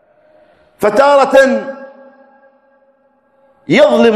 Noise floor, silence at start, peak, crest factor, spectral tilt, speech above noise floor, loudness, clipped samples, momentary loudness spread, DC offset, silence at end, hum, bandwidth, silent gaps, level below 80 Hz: -55 dBFS; 0.8 s; 0 dBFS; 14 dB; -5 dB/octave; 46 dB; -10 LUFS; 0.6%; 15 LU; under 0.1%; 0 s; none; 13.5 kHz; none; -54 dBFS